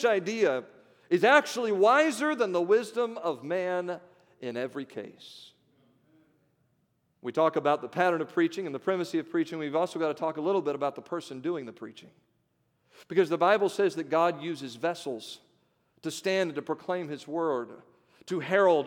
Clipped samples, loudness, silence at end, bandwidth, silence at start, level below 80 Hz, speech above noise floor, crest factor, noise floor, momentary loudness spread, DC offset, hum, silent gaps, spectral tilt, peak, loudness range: under 0.1%; -28 LUFS; 0 s; 16.5 kHz; 0 s; -86 dBFS; 45 dB; 22 dB; -73 dBFS; 16 LU; under 0.1%; none; none; -5 dB/octave; -6 dBFS; 9 LU